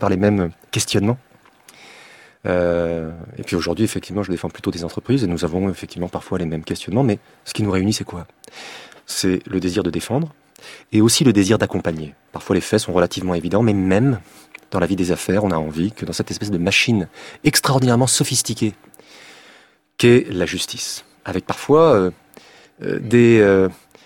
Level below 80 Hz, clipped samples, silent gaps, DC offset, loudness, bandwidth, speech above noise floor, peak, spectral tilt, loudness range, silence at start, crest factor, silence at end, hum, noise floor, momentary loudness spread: -48 dBFS; under 0.1%; none; under 0.1%; -19 LUFS; 17 kHz; 33 dB; -2 dBFS; -5 dB/octave; 5 LU; 0 s; 18 dB; 0.3 s; none; -51 dBFS; 14 LU